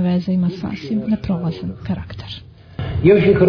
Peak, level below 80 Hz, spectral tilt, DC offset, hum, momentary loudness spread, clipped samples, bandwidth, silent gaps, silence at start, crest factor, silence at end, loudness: -2 dBFS; -38 dBFS; -9.5 dB/octave; under 0.1%; none; 18 LU; under 0.1%; 5.4 kHz; none; 0 s; 16 dB; 0 s; -19 LUFS